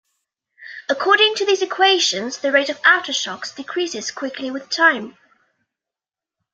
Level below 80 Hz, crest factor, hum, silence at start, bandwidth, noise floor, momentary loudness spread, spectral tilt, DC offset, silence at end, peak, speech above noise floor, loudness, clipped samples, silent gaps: -74 dBFS; 20 dB; none; 0.6 s; 9.2 kHz; -89 dBFS; 13 LU; -1 dB/octave; under 0.1%; 1.45 s; 0 dBFS; 70 dB; -18 LUFS; under 0.1%; none